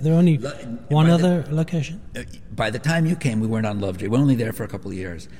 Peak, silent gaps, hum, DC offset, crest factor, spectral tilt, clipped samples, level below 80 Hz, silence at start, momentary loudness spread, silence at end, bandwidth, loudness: -6 dBFS; none; none; 1%; 14 dB; -7 dB/octave; under 0.1%; -48 dBFS; 0 s; 15 LU; 0.05 s; 16 kHz; -21 LUFS